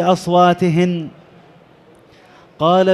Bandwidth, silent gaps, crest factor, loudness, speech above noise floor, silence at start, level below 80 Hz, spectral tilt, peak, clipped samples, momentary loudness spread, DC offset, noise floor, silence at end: 12.5 kHz; none; 16 dB; -15 LUFS; 33 dB; 0 s; -58 dBFS; -7 dB/octave; -2 dBFS; under 0.1%; 11 LU; under 0.1%; -47 dBFS; 0 s